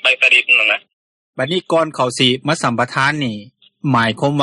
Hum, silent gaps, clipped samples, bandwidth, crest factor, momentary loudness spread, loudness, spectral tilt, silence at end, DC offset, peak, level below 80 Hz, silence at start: none; 0.93-1.33 s; under 0.1%; 11.5 kHz; 16 dB; 14 LU; -15 LUFS; -4 dB/octave; 0 s; under 0.1%; -2 dBFS; -58 dBFS; 0.05 s